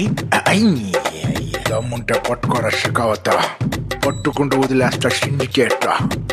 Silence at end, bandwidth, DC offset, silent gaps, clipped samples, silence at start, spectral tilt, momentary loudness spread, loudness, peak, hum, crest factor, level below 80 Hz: 0 s; 15 kHz; under 0.1%; none; under 0.1%; 0 s; -5 dB/octave; 6 LU; -18 LUFS; -2 dBFS; none; 16 dB; -40 dBFS